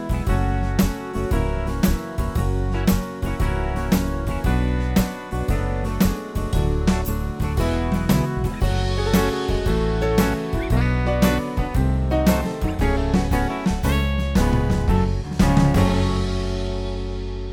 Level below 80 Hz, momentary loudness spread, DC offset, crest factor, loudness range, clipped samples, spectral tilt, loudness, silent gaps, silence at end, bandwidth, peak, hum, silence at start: -24 dBFS; 6 LU; under 0.1%; 16 dB; 3 LU; under 0.1%; -6.5 dB/octave; -22 LUFS; none; 0 s; 18.5 kHz; -4 dBFS; none; 0 s